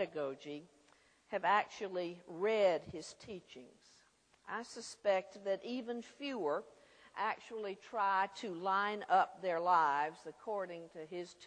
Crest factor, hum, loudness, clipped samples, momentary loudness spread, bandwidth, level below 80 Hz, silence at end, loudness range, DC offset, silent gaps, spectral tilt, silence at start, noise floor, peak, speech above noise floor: 20 dB; none; -37 LUFS; under 0.1%; 16 LU; 10 kHz; -82 dBFS; 0 s; 6 LU; under 0.1%; none; -4 dB/octave; 0 s; -70 dBFS; -18 dBFS; 33 dB